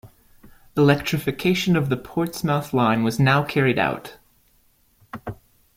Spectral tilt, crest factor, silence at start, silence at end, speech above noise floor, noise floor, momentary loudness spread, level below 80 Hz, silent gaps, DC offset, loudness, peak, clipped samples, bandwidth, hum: -6 dB/octave; 20 dB; 0.05 s; 0.4 s; 40 dB; -60 dBFS; 17 LU; -52 dBFS; none; under 0.1%; -21 LUFS; -2 dBFS; under 0.1%; 16.5 kHz; none